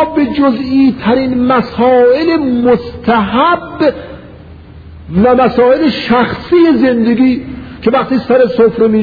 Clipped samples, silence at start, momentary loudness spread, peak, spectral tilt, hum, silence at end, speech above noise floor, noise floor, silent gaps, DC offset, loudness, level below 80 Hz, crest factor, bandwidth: under 0.1%; 0 s; 6 LU; 0 dBFS; -8.5 dB/octave; none; 0 s; 23 dB; -33 dBFS; none; 0.1%; -10 LUFS; -38 dBFS; 10 dB; 5 kHz